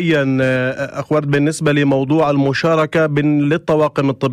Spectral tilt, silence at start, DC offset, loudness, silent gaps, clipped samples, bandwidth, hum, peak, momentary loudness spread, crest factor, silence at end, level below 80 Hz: -6.5 dB/octave; 0 s; under 0.1%; -16 LUFS; none; under 0.1%; 12.5 kHz; none; -2 dBFS; 4 LU; 12 dB; 0 s; -50 dBFS